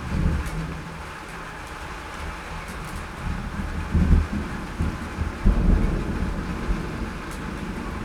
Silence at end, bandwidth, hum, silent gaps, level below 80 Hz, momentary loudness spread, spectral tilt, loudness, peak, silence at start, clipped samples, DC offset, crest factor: 0 s; 13.5 kHz; none; none; -28 dBFS; 13 LU; -6.5 dB/octave; -28 LUFS; -4 dBFS; 0 s; under 0.1%; under 0.1%; 22 dB